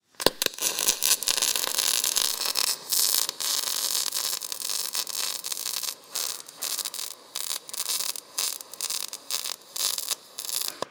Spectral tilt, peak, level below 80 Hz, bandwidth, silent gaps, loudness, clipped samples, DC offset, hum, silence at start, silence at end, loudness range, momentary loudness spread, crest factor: 1.5 dB/octave; 0 dBFS; -66 dBFS; 19 kHz; none; -26 LUFS; under 0.1%; under 0.1%; none; 0.2 s; 0 s; 7 LU; 9 LU; 28 dB